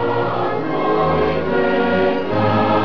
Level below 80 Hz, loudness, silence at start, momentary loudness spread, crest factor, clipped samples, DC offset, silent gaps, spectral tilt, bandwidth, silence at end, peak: -42 dBFS; -18 LUFS; 0 s; 4 LU; 12 dB; under 0.1%; 3%; none; -8.5 dB/octave; 5.4 kHz; 0 s; -6 dBFS